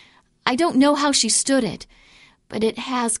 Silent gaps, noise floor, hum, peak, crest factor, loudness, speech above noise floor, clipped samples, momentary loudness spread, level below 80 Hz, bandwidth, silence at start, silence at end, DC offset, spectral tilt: none; -52 dBFS; none; -2 dBFS; 18 dB; -19 LUFS; 32 dB; under 0.1%; 11 LU; -56 dBFS; 11.5 kHz; 0.45 s; 0.05 s; under 0.1%; -2.5 dB/octave